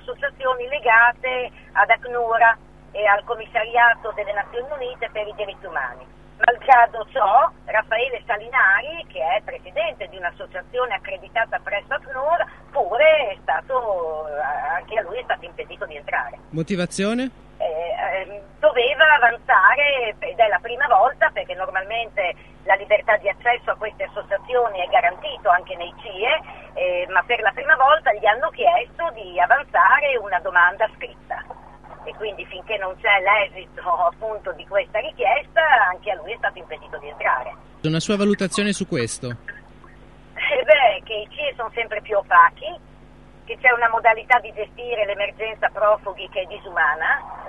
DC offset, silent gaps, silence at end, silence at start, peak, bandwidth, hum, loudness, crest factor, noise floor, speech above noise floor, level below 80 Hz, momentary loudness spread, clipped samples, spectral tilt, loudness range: 0.3%; none; 0 s; 0.05 s; 0 dBFS; 11.5 kHz; none; -20 LUFS; 20 dB; -47 dBFS; 26 dB; -52 dBFS; 15 LU; under 0.1%; -4 dB/octave; 6 LU